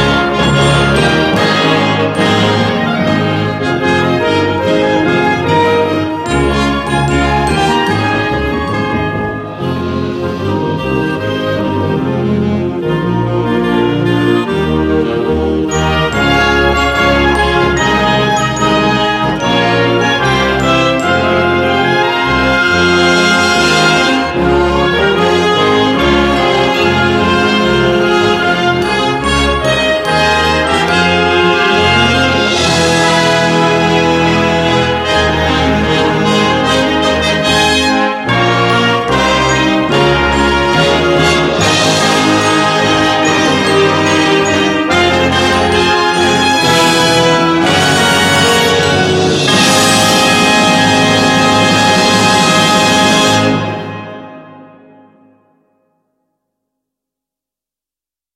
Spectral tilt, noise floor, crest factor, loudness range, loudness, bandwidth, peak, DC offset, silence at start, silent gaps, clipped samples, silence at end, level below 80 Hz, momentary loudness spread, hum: -4.5 dB/octave; -89 dBFS; 12 dB; 5 LU; -10 LUFS; 15.5 kHz; 0 dBFS; under 0.1%; 0 s; none; under 0.1%; 3.7 s; -30 dBFS; 6 LU; none